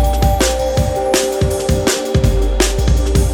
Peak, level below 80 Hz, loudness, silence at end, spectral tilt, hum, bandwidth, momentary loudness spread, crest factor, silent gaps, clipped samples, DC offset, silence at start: 0 dBFS; -18 dBFS; -15 LUFS; 0 s; -5 dB/octave; none; 18 kHz; 2 LU; 14 dB; none; under 0.1%; under 0.1%; 0 s